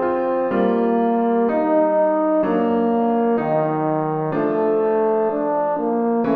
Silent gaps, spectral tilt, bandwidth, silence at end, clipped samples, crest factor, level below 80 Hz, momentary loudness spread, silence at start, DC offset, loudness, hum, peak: none; -10.5 dB/octave; 4.6 kHz; 0 s; under 0.1%; 12 dB; -58 dBFS; 3 LU; 0 s; under 0.1%; -19 LUFS; none; -6 dBFS